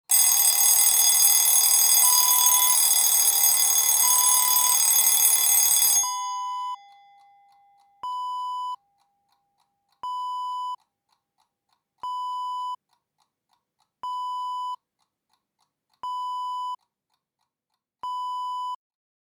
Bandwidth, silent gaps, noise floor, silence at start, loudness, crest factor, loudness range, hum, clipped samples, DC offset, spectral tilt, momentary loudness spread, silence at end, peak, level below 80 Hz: over 20 kHz; none; -83 dBFS; 0.1 s; -16 LUFS; 22 dB; 20 LU; none; under 0.1%; under 0.1%; 4.5 dB/octave; 20 LU; 0.5 s; -2 dBFS; -74 dBFS